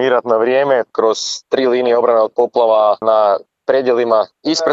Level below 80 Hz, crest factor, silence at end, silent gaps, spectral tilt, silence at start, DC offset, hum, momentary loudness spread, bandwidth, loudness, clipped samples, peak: -70 dBFS; 14 dB; 0 s; none; -3.5 dB/octave; 0 s; under 0.1%; none; 5 LU; 8 kHz; -14 LUFS; under 0.1%; 0 dBFS